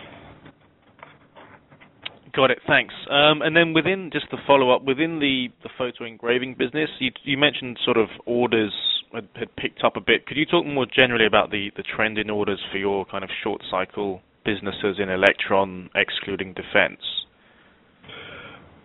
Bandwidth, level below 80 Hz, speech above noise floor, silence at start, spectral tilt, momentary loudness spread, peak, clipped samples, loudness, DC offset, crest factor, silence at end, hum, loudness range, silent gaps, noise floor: 4.5 kHz; -56 dBFS; 34 dB; 0 s; -2 dB/octave; 13 LU; 0 dBFS; under 0.1%; -22 LUFS; under 0.1%; 24 dB; 0.3 s; none; 5 LU; none; -56 dBFS